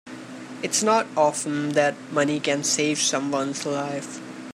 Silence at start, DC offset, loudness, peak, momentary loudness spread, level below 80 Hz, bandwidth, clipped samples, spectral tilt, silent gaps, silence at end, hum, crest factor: 0.05 s; under 0.1%; -23 LUFS; -6 dBFS; 15 LU; -74 dBFS; 15.5 kHz; under 0.1%; -3 dB/octave; none; 0 s; none; 18 dB